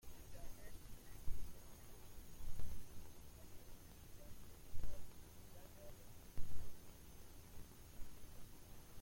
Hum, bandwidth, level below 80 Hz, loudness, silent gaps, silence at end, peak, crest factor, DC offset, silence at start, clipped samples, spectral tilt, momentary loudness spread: none; 16.5 kHz; -56 dBFS; -59 LUFS; none; 0 s; -26 dBFS; 16 dB; under 0.1%; 0.05 s; under 0.1%; -4.5 dB/octave; 6 LU